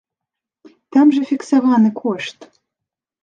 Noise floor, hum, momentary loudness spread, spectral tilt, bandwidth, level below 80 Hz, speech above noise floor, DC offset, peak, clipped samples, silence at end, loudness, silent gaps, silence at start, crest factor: -84 dBFS; none; 11 LU; -6 dB/octave; 9.2 kHz; -72 dBFS; 69 dB; under 0.1%; -2 dBFS; under 0.1%; 0.8 s; -16 LUFS; none; 0.95 s; 16 dB